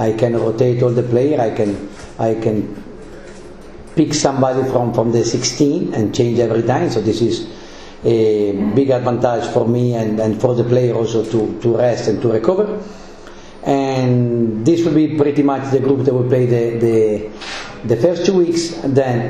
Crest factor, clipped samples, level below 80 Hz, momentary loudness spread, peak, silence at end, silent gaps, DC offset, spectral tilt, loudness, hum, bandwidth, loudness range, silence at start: 16 dB; under 0.1%; -44 dBFS; 12 LU; 0 dBFS; 0 s; none; under 0.1%; -6.5 dB/octave; -16 LUFS; none; 10 kHz; 3 LU; 0 s